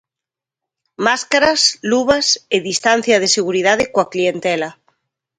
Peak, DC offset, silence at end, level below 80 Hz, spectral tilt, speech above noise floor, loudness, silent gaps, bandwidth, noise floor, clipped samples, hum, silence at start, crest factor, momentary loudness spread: 0 dBFS; under 0.1%; 0.65 s; -54 dBFS; -2 dB/octave; 71 dB; -15 LUFS; none; 11 kHz; -87 dBFS; under 0.1%; none; 1 s; 18 dB; 6 LU